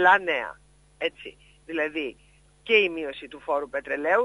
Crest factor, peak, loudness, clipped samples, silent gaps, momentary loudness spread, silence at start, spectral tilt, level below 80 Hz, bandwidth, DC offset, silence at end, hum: 22 dB; -6 dBFS; -26 LUFS; under 0.1%; none; 17 LU; 0 s; -4 dB/octave; -60 dBFS; 11 kHz; under 0.1%; 0 s; none